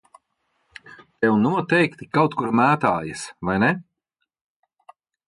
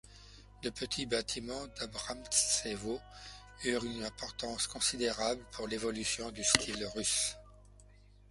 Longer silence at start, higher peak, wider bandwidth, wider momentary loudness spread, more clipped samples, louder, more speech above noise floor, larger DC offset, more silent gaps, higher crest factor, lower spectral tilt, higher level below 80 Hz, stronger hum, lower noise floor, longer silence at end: first, 0.9 s vs 0.05 s; about the same, -4 dBFS vs -6 dBFS; about the same, 11.5 kHz vs 12 kHz; second, 9 LU vs 14 LU; neither; first, -21 LUFS vs -34 LUFS; first, 58 dB vs 23 dB; neither; neither; second, 18 dB vs 30 dB; first, -6.5 dB/octave vs -1.5 dB/octave; about the same, -56 dBFS vs -56 dBFS; second, none vs 50 Hz at -55 dBFS; first, -78 dBFS vs -59 dBFS; first, 1.45 s vs 0.35 s